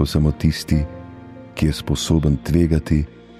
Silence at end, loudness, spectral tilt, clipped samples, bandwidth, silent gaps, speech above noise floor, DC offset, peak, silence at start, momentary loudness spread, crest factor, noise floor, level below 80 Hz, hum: 0.2 s; -20 LUFS; -6.5 dB/octave; under 0.1%; 14.5 kHz; none; 20 dB; under 0.1%; -4 dBFS; 0 s; 17 LU; 16 dB; -38 dBFS; -28 dBFS; none